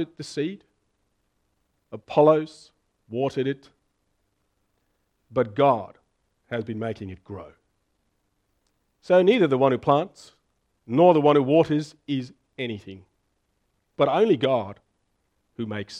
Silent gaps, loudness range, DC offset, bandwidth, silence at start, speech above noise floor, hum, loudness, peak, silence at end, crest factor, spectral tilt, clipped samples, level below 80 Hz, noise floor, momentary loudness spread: none; 8 LU; under 0.1%; 10 kHz; 0 s; 50 dB; none; -23 LUFS; -4 dBFS; 0 s; 22 dB; -7 dB/octave; under 0.1%; -66 dBFS; -72 dBFS; 20 LU